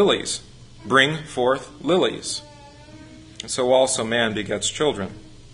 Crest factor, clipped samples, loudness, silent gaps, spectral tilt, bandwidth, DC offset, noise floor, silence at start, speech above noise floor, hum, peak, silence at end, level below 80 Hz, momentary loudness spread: 22 dB; under 0.1%; -21 LUFS; none; -3 dB/octave; 11 kHz; under 0.1%; -44 dBFS; 0 s; 23 dB; none; -2 dBFS; 0 s; -52 dBFS; 13 LU